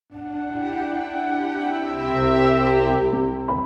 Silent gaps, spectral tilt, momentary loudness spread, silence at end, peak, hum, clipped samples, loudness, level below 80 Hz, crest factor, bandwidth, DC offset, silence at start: none; -8 dB/octave; 10 LU; 0 s; -6 dBFS; none; under 0.1%; -22 LUFS; -40 dBFS; 14 dB; 7.8 kHz; under 0.1%; 0.1 s